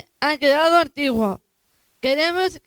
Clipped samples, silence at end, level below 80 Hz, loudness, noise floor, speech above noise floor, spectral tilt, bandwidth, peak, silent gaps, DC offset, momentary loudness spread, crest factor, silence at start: under 0.1%; 0.1 s; -56 dBFS; -19 LUFS; -66 dBFS; 47 dB; -4 dB/octave; over 20 kHz; -2 dBFS; none; under 0.1%; 10 LU; 18 dB; 0.2 s